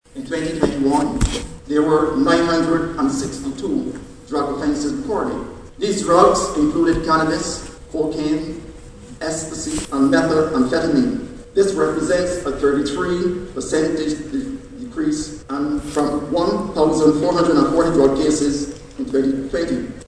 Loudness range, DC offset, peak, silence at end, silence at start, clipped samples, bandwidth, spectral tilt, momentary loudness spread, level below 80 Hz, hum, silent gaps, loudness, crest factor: 5 LU; under 0.1%; 0 dBFS; 0 s; 0.15 s; under 0.1%; 11 kHz; -5 dB/octave; 11 LU; -38 dBFS; none; none; -19 LUFS; 18 dB